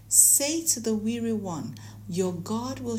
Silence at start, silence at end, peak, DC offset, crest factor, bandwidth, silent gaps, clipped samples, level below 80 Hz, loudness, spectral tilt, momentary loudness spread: 0.05 s; 0 s; -2 dBFS; under 0.1%; 24 dB; 16 kHz; none; under 0.1%; -58 dBFS; -23 LUFS; -3 dB/octave; 18 LU